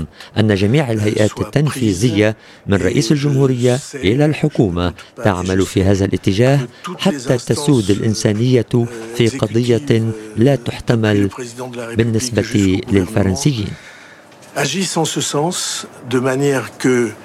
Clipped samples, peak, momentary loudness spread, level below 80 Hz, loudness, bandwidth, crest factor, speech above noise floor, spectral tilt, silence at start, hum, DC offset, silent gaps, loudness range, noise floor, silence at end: under 0.1%; 0 dBFS; 7 LU; -44 dBFS; -16 LUFS; 14.5 kHz; 16 dB; 25 dB; -5.5 dB/octave; 0 s; none; under 0.1%; none; 3 LU; -41 dBFS; 0 s